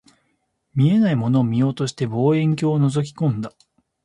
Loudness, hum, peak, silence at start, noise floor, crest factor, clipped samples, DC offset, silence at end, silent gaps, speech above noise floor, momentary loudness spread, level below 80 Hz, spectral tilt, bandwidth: -20 LUFS; none; -6 dBFS; 0.75 s; -70 dBFS; 14 dB; under 0.1%; under 0.1%; 0.55 s; none; 51 dB; 7 LU; -58 dBFS; -8 dB/octave; 11 kHz